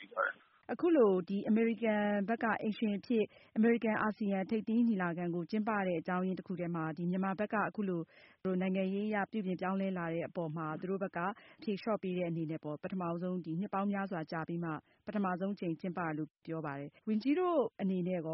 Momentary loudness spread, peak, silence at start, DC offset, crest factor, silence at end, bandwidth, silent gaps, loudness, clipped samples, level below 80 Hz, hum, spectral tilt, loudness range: 9 LU; -18 dBFS; 0 s; under 0.1%; 16 dB; 0 s; 5.8 kHz; none; -35 LUFS; under 0.1%; -76 dBFS; none; -6.5 dB/octave; 5 LU